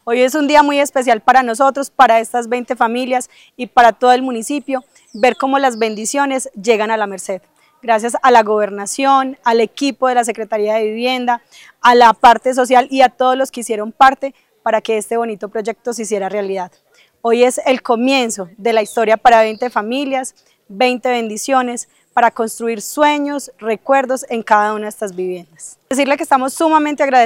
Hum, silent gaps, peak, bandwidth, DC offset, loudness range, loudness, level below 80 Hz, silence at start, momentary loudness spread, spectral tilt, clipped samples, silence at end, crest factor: none; none; 0 dBFS; 16.5 kHz; under 0.1%; 5 LU; -15 LUFS; -56 dBFS; 0.05 s; 12 LU; -3 dB/octave; under 0.1%; 0 s; 14 dB